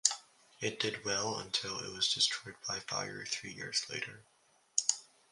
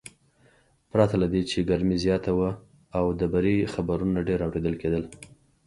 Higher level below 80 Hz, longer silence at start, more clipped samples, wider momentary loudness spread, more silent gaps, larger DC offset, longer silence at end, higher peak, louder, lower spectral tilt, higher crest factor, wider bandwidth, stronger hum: second, -72 dBFS vs -44 dBFS; about the same, 0.05 s vs 0.05 s; neither; first, 9 LU vs 6 LU; neither; neither; about the same, 0.3 s vs 0.4 s; about the same, -8 dBFS vs -6 dBFS; second, -35 LUFS vs -26 LUFS; second, -0.5 dB/octave vs -7 dB/octave; first, 30 dB vs 20 dB; about the same, 11.5 kHz vs 11.5 kHz; neither